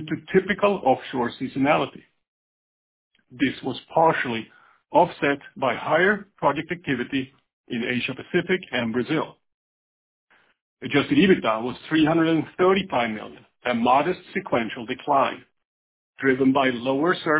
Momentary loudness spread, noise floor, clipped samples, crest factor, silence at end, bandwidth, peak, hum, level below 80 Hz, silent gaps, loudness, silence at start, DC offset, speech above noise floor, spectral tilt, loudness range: 10 LU; under -90 dBFS; under 0.1%; 18 dB; 0 s; 4 kHz; -4 dBFS; none; -60 dBFS; 2.28-3.11 s, 7.53-7.64 s, 9.54-10.27 s, 10.61-10.77 s, 15.65-16.13 s; -23 LUFS; 0 s; under 0.1%; over 67 dB; -9.5 dB/octave; 5 LU